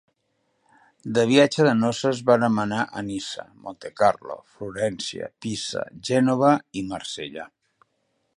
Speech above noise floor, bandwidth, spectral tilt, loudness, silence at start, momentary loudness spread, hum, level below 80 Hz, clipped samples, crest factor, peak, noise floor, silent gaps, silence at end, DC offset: 49 dB; 11.5 kHz; -5 dB/octave; -23 LUFS; 1.05 s; 18 LU; none; -62 dBFS; under 0.1%; 22 dB; -4 dBFS; -72 dBFS; none; 0.9 s; under 0.1%